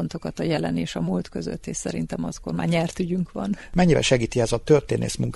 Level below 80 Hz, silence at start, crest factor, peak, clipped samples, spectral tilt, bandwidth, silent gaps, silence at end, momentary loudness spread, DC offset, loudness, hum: -42 dBFS; 0 s; 20 dB; -4 dBFS; under 0.1%; -5.5 dB/octave; 11.5 kHz; none; 0 s; 10 LU; under 0.1%; -24 LUFS; none